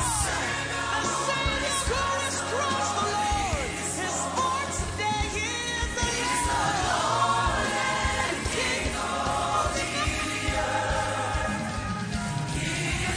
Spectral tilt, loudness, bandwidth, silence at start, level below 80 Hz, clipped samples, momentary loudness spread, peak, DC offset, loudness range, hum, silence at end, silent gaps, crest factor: -3 dB/octave; -27 LUFS; 11 kHz; 0 s; -38 dBFS; under 0.1%; 4 LU; -12 dBFS; under 0.1%; 2 LU; none; 0 s; none; 16 dB